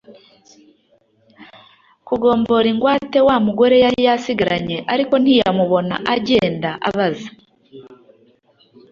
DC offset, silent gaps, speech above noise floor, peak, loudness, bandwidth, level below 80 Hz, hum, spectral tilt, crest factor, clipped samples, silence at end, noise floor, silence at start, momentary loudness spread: under 0.1%; none; 43 dB; 0 dBFS; -16 LUFS; 7.4 kHz; -52 dBFS; none; -6.5 dB/octave; 18 dB; under 0.1%; 1 s; -58 dBFS; 0.1 s; 8 LU